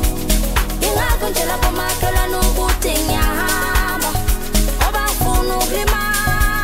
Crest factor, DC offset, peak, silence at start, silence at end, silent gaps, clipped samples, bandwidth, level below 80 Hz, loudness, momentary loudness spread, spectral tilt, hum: 14 dB; under 0.1%; -4 dBFS; 0 s; 0 s; none; under 0.1%; 16.5 kHz; -20 dBFS; -17 LUFS; 2 LU; -3.5 dB/octave; none